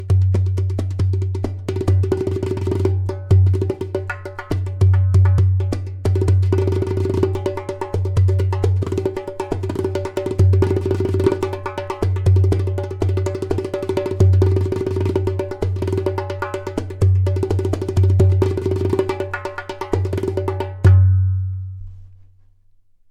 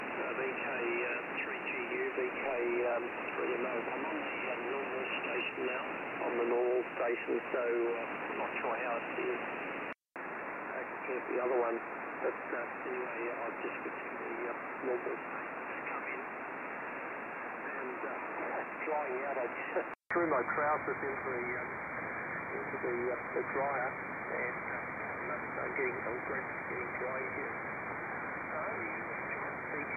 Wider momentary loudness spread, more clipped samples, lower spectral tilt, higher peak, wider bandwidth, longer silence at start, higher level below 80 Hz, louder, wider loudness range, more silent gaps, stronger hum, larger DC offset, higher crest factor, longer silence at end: first, 10 LU vs 7 LU; neither; first, -8.5 dB/octave vs -7 dB/octave; first, -2 dBFS vs -20 dBFS; first, 8.4 kHz vs 3.8 kHz; about the same, 0 s vs 0 s; first, -38 dBFS vs -72 dBFS; first, -19 LUFS vs -37 LUFS; about the same, 2 LU vs 4 LU; neither; neither; neither; about the same, 16 dB vs 16 dB; first, 0.95 s vs 0 s